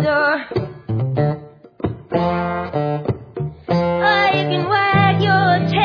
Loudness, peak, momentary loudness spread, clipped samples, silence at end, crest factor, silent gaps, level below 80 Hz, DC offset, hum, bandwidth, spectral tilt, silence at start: -18 LUFS; -2 dBFS; 12 LU; under 0.1%; 0 s; 16 dB; none; -46 dBFS; under 0.1%; none; 5.4 kHz; -8 dB/octave; 0 s